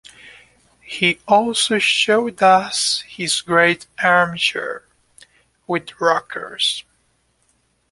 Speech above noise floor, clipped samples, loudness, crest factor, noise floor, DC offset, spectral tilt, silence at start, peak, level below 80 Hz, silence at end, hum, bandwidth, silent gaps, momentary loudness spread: 46 dB; under 0.1%; -17 LUFS; 18 dB; -64 dBFS; under 0.1%; -2.5 dB/octave; 0.25 s; -2 dBFS; -60 dBFS; 1.1 s; none; 11.5 kHz; none; 12 LU